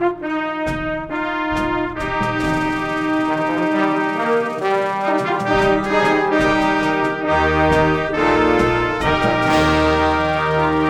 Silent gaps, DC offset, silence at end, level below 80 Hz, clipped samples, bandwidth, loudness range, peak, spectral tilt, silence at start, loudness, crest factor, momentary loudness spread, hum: none; under 0.1%; 0 s; -36 dBFS; under 0.1%; 12.5 kHz; 4 LU; -2 dBFS; -6 dB/octave; 0 s; -18 LUFS; 16 dB; 7 LU; none